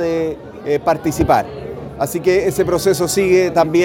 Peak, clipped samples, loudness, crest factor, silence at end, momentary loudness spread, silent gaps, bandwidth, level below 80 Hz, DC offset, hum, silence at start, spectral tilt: 0 dBFS; under 0.1%; -16 LUFS; 16 dB; 0 s; 13 LU; none; 17 kHz; -40 dBFS; under 0.1%; none; 0 s; -5 dB/octave